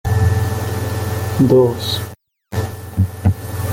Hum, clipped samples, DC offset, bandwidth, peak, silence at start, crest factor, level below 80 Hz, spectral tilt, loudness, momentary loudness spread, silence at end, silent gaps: none; under 0.1%; under 0.1%; 17 kHz; -2 dBFS; 0.05 s; 14 dB; -38 dBFS; -6.5 dB/octave; -18 LUFS; 12 LU; 0 s; none